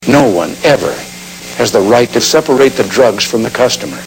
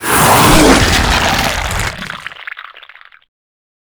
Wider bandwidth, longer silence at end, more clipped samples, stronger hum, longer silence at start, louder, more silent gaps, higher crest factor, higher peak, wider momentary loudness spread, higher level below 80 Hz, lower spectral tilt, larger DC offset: second, 17.5 kHz vs over 20 kHz; second, 0 s vs 1.1 s; about the same, 0.3% vs 0.2%; neither; about the same, 0 s vs 0 s; about the same, -10 LUFS vs -10 LUFS; neither; about the same, 10 dB vs 14 dB; about the same, 0 dBFS vs 0 dBFS; second, 11 LU vs 20 LU; second, -44 dBFS vs -24 dBFS; about the same, -4 dB/octave vs -3.5 dB/octave; neither